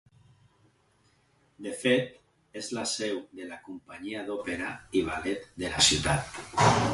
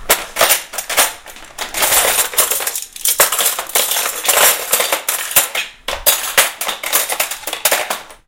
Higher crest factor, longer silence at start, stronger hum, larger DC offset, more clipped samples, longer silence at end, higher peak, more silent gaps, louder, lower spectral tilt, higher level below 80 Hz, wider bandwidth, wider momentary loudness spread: first, 24 dB vs 16 dB; first, 1.6 s vs 0 s; neither; neither; neither; second, 0 s vs 0.15 s; second, -6 dBFS vs 0 dBFS; neither; second, -28 LUFS vs -14 LUFS; first, -3.5 dB/octave vs 1.5 dB/octave; second, -52 dBFS vs -44 dBFS; second, 11.5 kHz vs over 20 kHz; first, 20 LU vs 10 LU